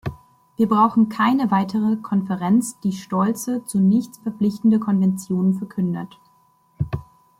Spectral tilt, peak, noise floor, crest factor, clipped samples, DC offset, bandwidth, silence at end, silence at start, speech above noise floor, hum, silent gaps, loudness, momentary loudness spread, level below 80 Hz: -7 dB/octave; -4 dBFS; -59 dBFS; 18 dB; under 0.1%; under 0.1%; 15 kHz; 0.35 s; 0.05 s; 39 dB; none; none; -21 LUFS; 12 LU; -52 dBFS